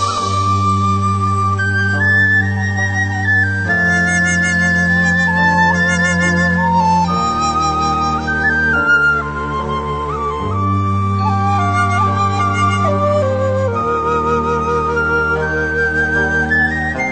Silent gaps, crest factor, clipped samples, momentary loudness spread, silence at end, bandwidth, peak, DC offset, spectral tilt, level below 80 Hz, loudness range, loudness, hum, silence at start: none; 12 dB; under 0.1%; 5 LU; 0 s; 9 kHz; -2 dBFS; under 0.1%; -5.5 dB/octave; -34 dBFS; 3 LU; -14 LUFS; none; 0 s